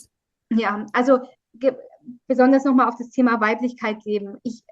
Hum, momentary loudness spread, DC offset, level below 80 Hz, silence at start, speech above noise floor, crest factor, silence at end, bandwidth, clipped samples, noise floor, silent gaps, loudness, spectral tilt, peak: none; 11 LU; under 0.1%; -70 dBFS; 0.5 s; 38 dB; 18 dB; 0.15 s; 7.6 kHz; under 0.1%; -59 dBFS; none; -20 LUFS; -6 dB/octave; -4 dBFS